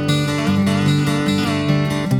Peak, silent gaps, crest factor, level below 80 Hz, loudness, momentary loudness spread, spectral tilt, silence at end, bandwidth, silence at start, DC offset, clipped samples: -4 dBFS; none; 12 dB; -44 dBFS; -18 LUFS; 2 LU; -6 dB/octave; 0 s; 16.5 kHz; 0 s; under 0.1%; under 0.1%